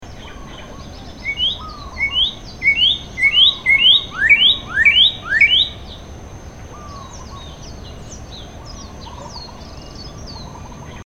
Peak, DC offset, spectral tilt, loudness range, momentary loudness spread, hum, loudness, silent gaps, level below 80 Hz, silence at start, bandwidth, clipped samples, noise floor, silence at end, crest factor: -2 dBFS; 0.3%; -2 dB/octave; 23 LU; 25 LU; none; -12 LUFS; none; -38 dBFS; 0 s; 15.5 kHz; under 0.1%; -34 dBFS; 0.05 s; 18 dB